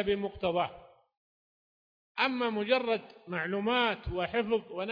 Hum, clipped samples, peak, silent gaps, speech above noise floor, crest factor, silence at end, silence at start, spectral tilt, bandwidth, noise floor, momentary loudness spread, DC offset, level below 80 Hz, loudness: none; under 0.1%; -12 dBFS; 1.17-2.15 s; over 59 dB; 20 dB; 0 s; 0 s; -7 dB/octave; 5.2 kHz; under -90 dBFS; 7 LU; under 0.1%; -54 dBFS; -31 LUFS